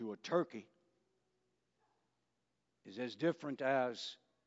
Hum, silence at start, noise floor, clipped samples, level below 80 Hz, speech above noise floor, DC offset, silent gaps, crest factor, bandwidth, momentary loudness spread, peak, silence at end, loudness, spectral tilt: none; 0 s; -86 dBFS; under 0.1%; under -90 dBFS; 47 dB; under 0.1%; none; 22 dB; 7.6 kHz; 12 LU; -20 dBFS; 0.3 s; -39 LUFS; -4 dB/octave